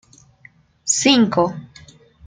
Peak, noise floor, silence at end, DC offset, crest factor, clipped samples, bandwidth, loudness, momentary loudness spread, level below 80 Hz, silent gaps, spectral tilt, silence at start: -2 dBFS; -51 dBFS; 0.65 s; under 0.1%; 18 dB; under 0.1%; 9.8 kHz; -16 LUFS; 16 LU; -58 dBFS; none; -3 dB/octave; 0.85 s